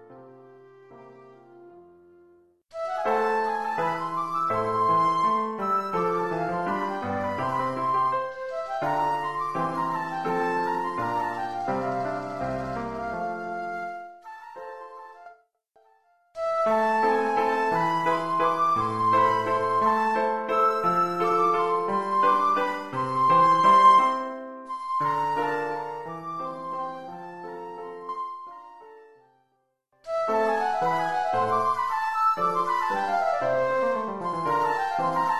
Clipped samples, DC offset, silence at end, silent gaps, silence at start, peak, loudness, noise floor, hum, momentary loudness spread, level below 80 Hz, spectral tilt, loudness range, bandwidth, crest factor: under 0.1%; 0.2%; 0 s; none; 0 s; -8 dBFS; -25 LUFS; -72 dBFS; none; 14 LU; -62 dBFS; -5.5 dB/octave; 13 LU; 13.5 kHz; 18 dB